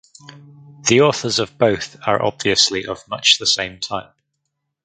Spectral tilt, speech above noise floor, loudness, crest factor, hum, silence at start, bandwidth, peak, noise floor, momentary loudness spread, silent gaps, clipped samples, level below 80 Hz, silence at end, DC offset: -2.5 dB/octave; 57 dB; -17 LUFS; 20 dB; none; 0.3 s; 9.6 kHz; 0 dBFS; -75 dBFS; 12 LU; none; under 0.1%; -54 dBFS; 0.8 s; under 0.1%